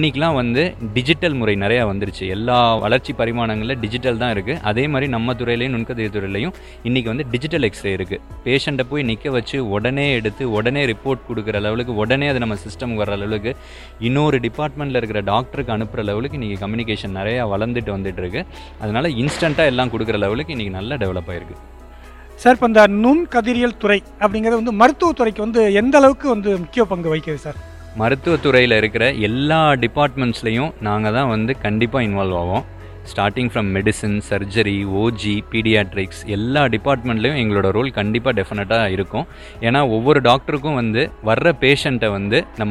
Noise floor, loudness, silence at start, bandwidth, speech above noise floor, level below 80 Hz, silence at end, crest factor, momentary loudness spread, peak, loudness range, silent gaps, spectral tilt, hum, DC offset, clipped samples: -38 dBFS; -18 LUFS; 0 s; 12.5 kHz; 20 dB; -38 dBFS; 0 s; 18 dB; 10 LU; 0 dBFS; 6 LU; none; -6 dB/octave; none; under 0.1%; under 0.1%